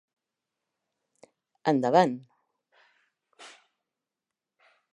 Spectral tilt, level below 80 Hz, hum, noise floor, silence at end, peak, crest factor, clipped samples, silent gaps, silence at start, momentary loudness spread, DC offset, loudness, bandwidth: -6.5 dB/octave; -84 dBFS; none; -89 dBFS; 1.45 s; -6 dBFS; 26 dB; under 0.1%; none; 1.65 s; 27 LU; under 0.1%; -25 LUFS; 10.5 kHz